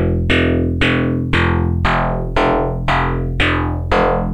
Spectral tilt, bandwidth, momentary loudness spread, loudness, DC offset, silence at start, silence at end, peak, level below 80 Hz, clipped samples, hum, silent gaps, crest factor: -7 dB/octave; 9.6 kHz; 3 LU; -16 LUFS; under 0.1%; 0 s; 0 s; -2 dBFS; -26 dBFS; under 0.1%; none; none; 14 dB